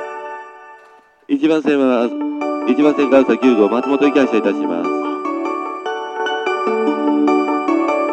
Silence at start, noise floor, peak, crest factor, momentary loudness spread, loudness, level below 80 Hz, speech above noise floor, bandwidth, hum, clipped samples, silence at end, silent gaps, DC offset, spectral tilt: 0 s; -47 dBFS; 0 dBFS; 16 dB; 10 LU; -16 LUFS; -66 dBFS; 33 dB; 8.4 kHz; none; under 0.1%; 0 s; none; under 0.1%; -5.5 dB/octave